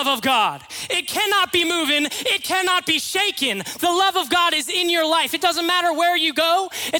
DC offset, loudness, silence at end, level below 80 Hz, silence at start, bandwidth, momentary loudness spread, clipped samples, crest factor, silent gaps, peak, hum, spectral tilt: under 0.1%; -19 LUFS; 0 s; -62 dBFS; 0 s; 18 kHz; 4 LU; under 0.1%; 16 dB; none; -4 dBFS; none; -1 dB/octave